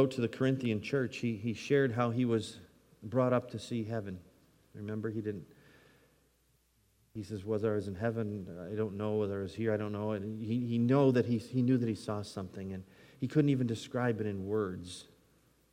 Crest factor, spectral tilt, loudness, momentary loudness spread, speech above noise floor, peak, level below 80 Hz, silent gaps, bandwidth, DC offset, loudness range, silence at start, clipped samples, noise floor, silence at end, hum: 18 dB; -7.5 dB/octave; -34 LUFS; 14 LU; 39 dB; -16 dBFS; -72 dBFS; none; 14 kHz; under 0.1%; 9 LU; 0 s; under 0.1%; -72 dBFS; 0.7 s; none